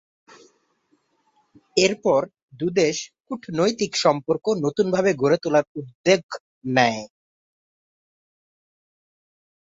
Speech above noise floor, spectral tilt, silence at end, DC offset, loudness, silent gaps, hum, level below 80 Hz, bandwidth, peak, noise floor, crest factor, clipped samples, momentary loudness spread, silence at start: 46 dB; -4.5 dB/octave; 2.7 s; under 0.1%; -22 LUFS; 2.42-2.48 s, 5.67-5.75 s, 5.95-6.04 s, 6.23-6.29 s, 6.40-6.61 s; none; -64 dBFS; 8 kHz; -2 dBFS; -67 dBFS; 22 dB; under 0.1%; 14 LU; 1.75 s